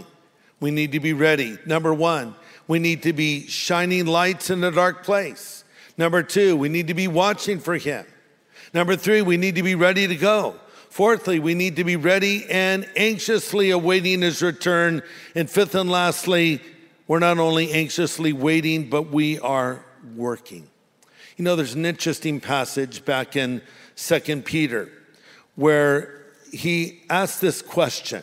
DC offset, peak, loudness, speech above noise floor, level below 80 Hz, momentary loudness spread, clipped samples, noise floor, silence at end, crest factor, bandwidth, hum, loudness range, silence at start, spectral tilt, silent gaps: under 0.1%; -2 dBFS; -21 LUFS; 36 dB; -66 dBFS; 11 LU; under 0.1%; -57 dBFS; 0 s; 20 dB; 16 kHz; none; 5 LU; 0 s; -4.5 dB/octave; none